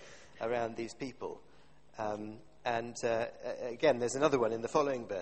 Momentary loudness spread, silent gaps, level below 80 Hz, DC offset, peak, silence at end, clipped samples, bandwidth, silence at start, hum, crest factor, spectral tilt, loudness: 15 LU; none; -68 dBFS; 0.2%; -14 dBFS; 0 s; under 0.1%; 8.4 kHz; 0 s; none; 22 dB; -4.5 dB/octave; -35 LUFS